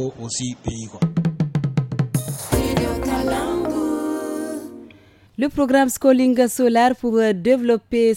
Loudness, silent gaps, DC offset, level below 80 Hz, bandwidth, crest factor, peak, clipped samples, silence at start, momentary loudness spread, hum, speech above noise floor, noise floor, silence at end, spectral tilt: -20 LUFS; none; under 0.1%; -40 dBFS; 17 kHz; 18 dB; -2 dBFS; under 0.1%; 0 s; 11 LU; none; 31 dB; -49 dBFS; 0 s; -6 dB/octave